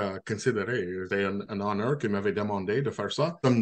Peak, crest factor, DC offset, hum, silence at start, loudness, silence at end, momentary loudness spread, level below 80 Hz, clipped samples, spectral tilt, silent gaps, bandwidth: -10 dBFS; 18 dB; under 0.1%; none; 0 s; -29 LUFS; 0 s; 4 LU; -68 dBFS; under 0.1%; -6 dB/octave; none; 9.6 kHz